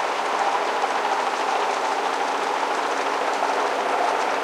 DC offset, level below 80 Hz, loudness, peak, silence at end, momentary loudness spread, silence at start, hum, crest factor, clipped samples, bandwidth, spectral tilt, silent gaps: under 0.1%; -84 dBFS; -23 LUFS; -10 dBFS; 0 s; 1 LU; 0 s; none; 14 dB; under 0.1%; 16 kHz; -1 dB/octave; none